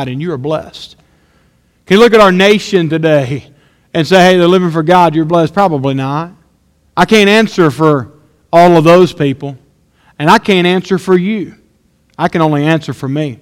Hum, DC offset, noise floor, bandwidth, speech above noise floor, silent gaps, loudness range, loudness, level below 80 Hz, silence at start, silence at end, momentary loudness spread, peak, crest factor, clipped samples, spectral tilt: none; under 0.1%; -53 dBFS; 16.5 kHz; 44 dB; none; 3 LU; -10 LUFS; -46 dBFS; 0 s; 0.05 s; 14 LU; 0 dBFS; 10 dB; 0.8%; -6 dB/octave